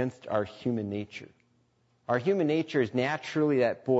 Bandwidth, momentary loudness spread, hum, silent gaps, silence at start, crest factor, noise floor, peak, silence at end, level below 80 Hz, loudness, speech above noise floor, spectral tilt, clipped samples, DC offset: 8 kHz; 11 LU; none; none; 0 s; 16 dB; -69 dBFS; -12 dBFS; 0 s; -70 dBFS; -29 LUFS; 41 dB; -7 dB/octave; under 0.1%; under 0.1%